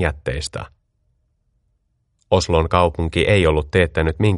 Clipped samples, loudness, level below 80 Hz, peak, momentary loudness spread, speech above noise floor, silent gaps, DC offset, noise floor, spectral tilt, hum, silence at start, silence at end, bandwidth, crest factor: under 0.1%; -18 LUFS; -32 dBFS; 0 dBFS; 12 LU; 49 dB; none; under 0.1%; -67 dBFS; -6 dB/octave; none; 0 s; 0 s; 11.5 kHz; 20 dB